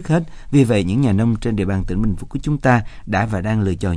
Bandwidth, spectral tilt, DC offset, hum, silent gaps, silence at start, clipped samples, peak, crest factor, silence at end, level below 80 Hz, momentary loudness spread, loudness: 11 kHz; -7.5 dB/octave; under 0.1%; none; none; 0 s; under 0.1%; -2 dBFS; 16 dB; 0 s; -32 dBFS; 6 LU; -19 LUFS